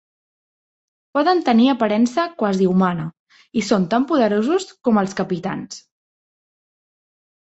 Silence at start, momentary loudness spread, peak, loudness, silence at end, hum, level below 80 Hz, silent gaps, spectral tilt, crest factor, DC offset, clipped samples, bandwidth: 1.15 s; 12 LU; -4 dBFS; -19 LUFS; 1.6 s; none; -62 dBFS; 3.19-3.26 s; -6 dB/octave; 16 dB; under 0.1%; under 0.1%; 8.2 kHz